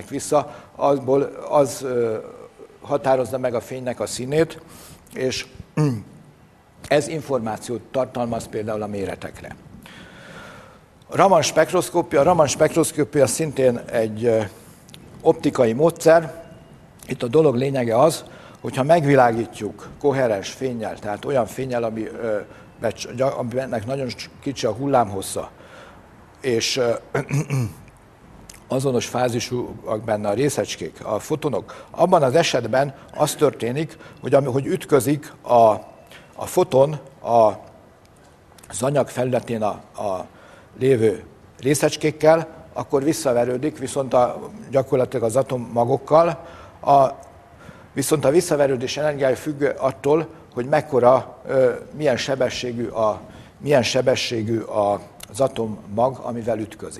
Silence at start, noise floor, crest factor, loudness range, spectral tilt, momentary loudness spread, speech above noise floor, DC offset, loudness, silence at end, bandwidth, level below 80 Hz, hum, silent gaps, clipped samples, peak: 0 s; -51 dBFS; 20 dB; 6 LU; -5 dB/octave; 14 LU; 31 dB; under 0.1%; -21 LUFS; 0 s; 13.5 kHz; -54 dBFS; none; none; under 0.1%; 0 dBFS